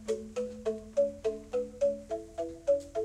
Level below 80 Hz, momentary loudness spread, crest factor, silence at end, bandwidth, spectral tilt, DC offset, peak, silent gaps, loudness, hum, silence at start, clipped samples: -58 dBFS; 8 LU; 14 dB; 0 s; 11.5 kHz; -5.5 dB/octave; under 0.1%; -18 dBFS; none; -34 LUFS; none; 0 s; under 0.1%